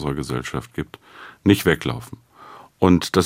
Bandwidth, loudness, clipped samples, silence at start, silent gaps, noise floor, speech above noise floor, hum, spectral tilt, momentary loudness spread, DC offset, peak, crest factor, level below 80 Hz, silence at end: 16 kHz; -21 LUFS; under 0.1%; 0 s; none; -45 dBFS; 24 dB; none; -6 dB/octave; 24 LU; under 0.1%; -2 dBFS; 20 dB; -46 dBFS; 0 s